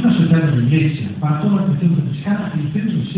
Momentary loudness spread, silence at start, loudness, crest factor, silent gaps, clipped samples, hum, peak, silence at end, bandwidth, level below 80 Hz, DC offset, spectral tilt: 6 LU; 0 s; -17 LUFS; 12 dB; none; under 0.1%; none; -2 dBFS; 0 s; 4 kHz; -48 dBFS; under 0.1%; -12 dB/octave